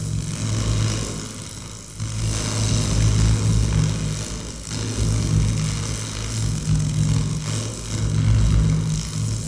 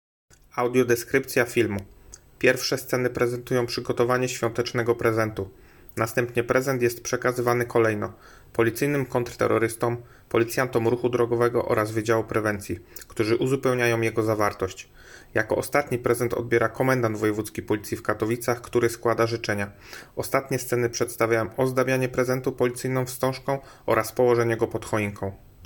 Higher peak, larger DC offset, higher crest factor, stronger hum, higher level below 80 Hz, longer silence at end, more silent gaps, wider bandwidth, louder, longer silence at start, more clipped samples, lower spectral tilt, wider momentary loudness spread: about the same, -8 dBFS vs -6 dBFS; first, 0.3% vs under 0.1%; about the same, 14 dB vs 18 dB; neither; first, -28 dBFS vs -54 dBFS; about the same, 0 s vs 0 s; neither; second, 11 kHz vs 17.5 kHz; first, -22 LUFS vs -25 LUFS; second, 0 s vs 0.55 s; neither; about the same, -5 dB/octave vs -5.5 dB/octave; about the same, 10 LU vs 8 LU